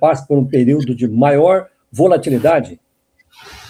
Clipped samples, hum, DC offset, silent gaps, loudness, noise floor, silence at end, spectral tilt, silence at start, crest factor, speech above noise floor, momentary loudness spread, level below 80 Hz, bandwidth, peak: under 0.1%; none; under 0.1%; none; -14 LUFS; -57 dBFS; 0.15 s; -8 dB/octave; 0 s; 14 dB; 44 dB; 6 LU; -54 dBFS; 15.5 kHz; 0 dBFS